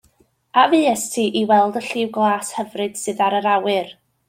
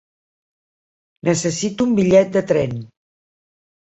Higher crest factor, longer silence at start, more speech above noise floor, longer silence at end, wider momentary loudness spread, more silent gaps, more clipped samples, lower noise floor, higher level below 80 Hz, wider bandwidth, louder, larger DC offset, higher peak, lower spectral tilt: about the same, 18 dB vs 18 dB; second, 0.55 s vs 1.25 s; second, 41 dB vs over 73 dB; second, 0.35 s vs 1.1 s; about the same, 10 LU vs 11 LU; neither; neither; second, -59 dBFS vs under -90 dBFS; second, -68 dBFS vs -52 dBFS; first, 16.5 kHz vs 8.2 kHz; about the same, -19 LUFS vs -18 LUFS; neither; about the same, -2 dBFS vs -2 dBFS; second, -3.5 dB/octave vs -5.5 dB/octave